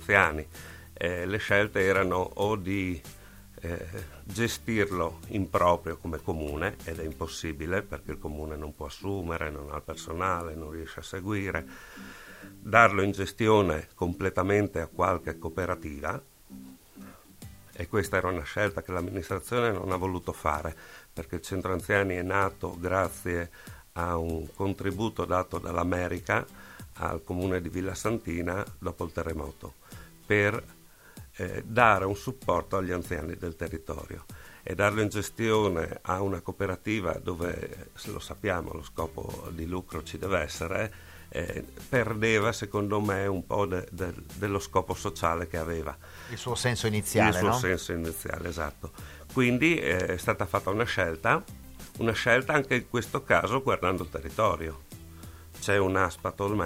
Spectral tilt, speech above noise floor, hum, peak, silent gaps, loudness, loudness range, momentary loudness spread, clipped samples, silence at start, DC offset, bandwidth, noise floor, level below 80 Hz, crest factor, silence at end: -5.5 dB/octave; 21 dB; none; -2 dBFS; none; -29 LUFS; 7 LU; 18 LU; under 0.1%; 0 s; under 0.1%; 16 kHz; -50 dBFS; -50 dBFS; 28 dB; 0 s